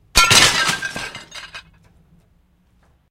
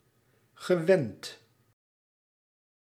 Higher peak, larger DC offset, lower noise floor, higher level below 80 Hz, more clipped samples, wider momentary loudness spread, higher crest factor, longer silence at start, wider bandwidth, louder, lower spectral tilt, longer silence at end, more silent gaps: first, 0 dBFS vs -10 dBFS; neither; second, -58 dBFS vs -68 dBFS; first, -36 dBFS vs -82 dBFS; neither; first, 24 LU vs 19 LU; about the same, 20 dB vs 22 dB; second, 0.15 s vs 0.6 s; about the same, 16.5 kHz vs 15 kHz; first, -13 LUFS vs -27 LUFS; second, -0.5 dB/octave vs -6 dB/octave; about the same, 1.5 s vs 1.5 s; neither